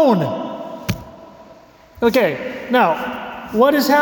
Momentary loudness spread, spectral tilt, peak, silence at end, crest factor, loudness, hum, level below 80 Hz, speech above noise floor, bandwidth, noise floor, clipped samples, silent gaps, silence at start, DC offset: 14 LU; -5.5 dB/octave; -4 dBFS; 0 s; 14 dB; -18 LUFS; none; -48 dBFS; 29 dB; 19 kHz; -45 dBFS; under 0.1%; none; 0 s; under 0.1%